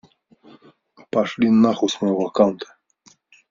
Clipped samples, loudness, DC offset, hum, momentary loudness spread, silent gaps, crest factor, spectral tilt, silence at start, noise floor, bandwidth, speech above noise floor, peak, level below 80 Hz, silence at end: under 0.1%; -19 LUFS; under 0.1%; none; 11 LU; none; 18 dB; -5.5 dB/octave; 1.15 s; -56 dBFS; 7.6 kHz; 38 dB; -2 dBFS; -62 dBFS; 0.85 s